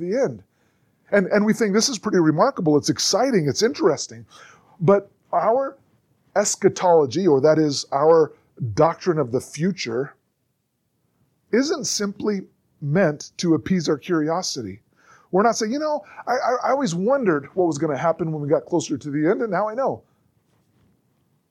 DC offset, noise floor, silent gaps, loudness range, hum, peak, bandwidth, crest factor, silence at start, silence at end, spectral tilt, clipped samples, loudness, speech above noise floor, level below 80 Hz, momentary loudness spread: under 0.1%; -72 dBFS; none; 6 LU; none; -4 dBFS; 15.5 kHz; 18 dB; 0 s; 1.5 s; -5 dB/octave; under 0.1%; -21 LUFS; 52 dB; -64 dBFS; 9 LU